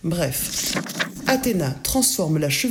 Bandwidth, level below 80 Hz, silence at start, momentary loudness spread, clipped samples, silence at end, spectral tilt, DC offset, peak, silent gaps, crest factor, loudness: 19.5 kHz; -44 dBFS; 0.05 s; 6 LU; under 0.1%; 0 s; -3.5 dB/octave; under 0.1%; -6 dBFS; none; 16 dB; -21 LUFS